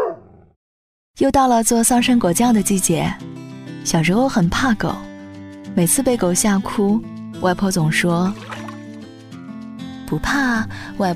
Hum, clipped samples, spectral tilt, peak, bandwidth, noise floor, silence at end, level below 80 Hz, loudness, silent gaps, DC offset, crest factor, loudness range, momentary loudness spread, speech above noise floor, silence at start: none; under 0.1%; -4.5 dB/octave; -2 dBFS; 16 kHz; under -90 dBFS; 0 s; -42 dBFS; -17 LUFS; 0.56-1.14 s; under 0.1%; 16 dB; 5 LU; 20 LU; over 73 dB; 0 s